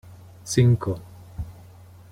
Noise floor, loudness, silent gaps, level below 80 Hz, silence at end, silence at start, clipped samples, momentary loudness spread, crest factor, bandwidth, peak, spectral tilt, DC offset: -47 dBFS; -22 LUFS; none; -46 dBFS; 0.6 s; 0.1 s; under 0.1%; 22 LU; 20 dB; 13.5 kHz; -6 dBFS; -6.5 dB/octave; under 0.1%